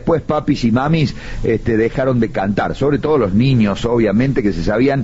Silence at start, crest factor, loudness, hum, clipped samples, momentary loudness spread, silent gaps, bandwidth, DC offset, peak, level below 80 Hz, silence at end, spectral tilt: 0 s; 12 dB; -16 LUFS; none; under 0.1%; 4 LU; none; 8 kHz; 0.4%; -4 dBFS; -32 dBFS; 0 s; -6.5 dB/octave